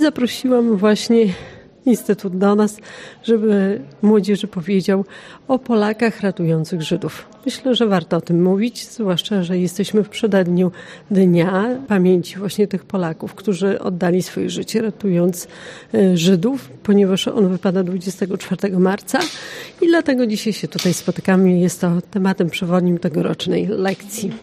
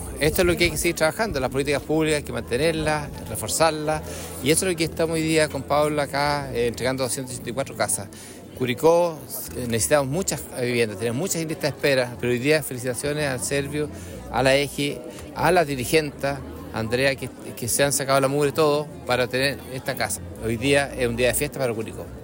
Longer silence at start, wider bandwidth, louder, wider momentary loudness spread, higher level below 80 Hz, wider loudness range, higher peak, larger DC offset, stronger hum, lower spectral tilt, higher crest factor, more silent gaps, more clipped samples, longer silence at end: about the same, 0 s vs 0 s; about the same, 15.5 kHz vs 16.5 kHz; first, -18 LUFS vs -23 LUFS; about the same, 9 LU vs 10 LU; second, -58 dBFS vs -44 dBFS; about the same, 2 LU vs 2 LU; first, -2 dBFS vs -6 dBFS; neither; neither; first, -6 dB/octave vs -4 dB/octave; about the same, 14 dB vs 18 dB; neither; neither; about the same, 0 s vs 0 s